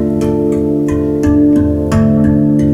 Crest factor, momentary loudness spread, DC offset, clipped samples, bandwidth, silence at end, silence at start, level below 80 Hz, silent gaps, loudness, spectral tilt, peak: 10 dB; 4 LU; under 0.1%; under 0.1%; 11 kHz; 0 s; 0 s; -28 dBFS; none; -12 LUFS; -9 dB/octave; 0 dBFS